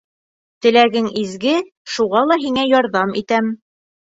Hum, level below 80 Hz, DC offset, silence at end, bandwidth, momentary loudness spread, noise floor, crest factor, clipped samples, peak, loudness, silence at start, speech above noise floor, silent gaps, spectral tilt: none; -60 dBFS; under 0.1%; 0.6 s; 8 kHz; 8 LU; under -90 dBFS; 16 dB; under 0.1%; -2 dBFS; -17 LUFS; 0.65 s; over 74 dB; 1.77-1.85 s; -4.5 dB/octave